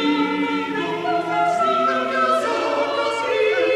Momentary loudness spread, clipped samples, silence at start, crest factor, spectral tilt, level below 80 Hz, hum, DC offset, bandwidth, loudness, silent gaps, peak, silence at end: 4 LU; under 0.1%; 0 s; 12 dB; -4.5 dB/octave; -66 dBFS; none; under 0.1%; 13 kHz; -20 LUFS; none; -8 dBFS; 0 s